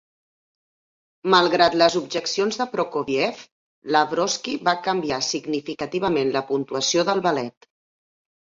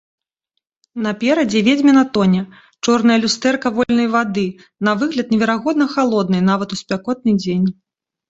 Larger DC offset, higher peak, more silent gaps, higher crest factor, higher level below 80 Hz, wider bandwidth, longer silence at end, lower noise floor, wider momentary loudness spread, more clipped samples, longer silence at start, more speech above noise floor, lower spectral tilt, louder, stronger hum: neither; about the same, -2 dBFS vs -2 dBFS; first, 3.52-3.82 s vs none; about the same, 20 dB vs 16 dB; second, -62 dBFS vs -56 dBFS; about the same, 7.8 kHz vs 8 kHz; first, 0.95 s vs 0.6 s; first, under -90 dBFS vs -76 dBFS; about the same, 10 LU vs 9 LU; neither; first, 1.25 s vs 0.95 s; first, over 68 dB vs 60 dB; second, -3.5 dB/octave vs -5.5 dB/octave; second, -22 LUFS vs -17 LUFS; neither